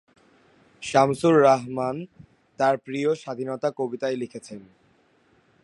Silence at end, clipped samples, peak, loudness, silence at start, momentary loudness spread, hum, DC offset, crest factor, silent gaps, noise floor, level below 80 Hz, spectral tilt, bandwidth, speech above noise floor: 1.05 s; under 0.1%; -4 dBFS; -23 LUFS; 0.8 s; 20 LU; none; under 0.1%; 22 dB; none; -62 dBFS; -66 dBFS; -6 dB/octave; 11.5 kHz; 39 dB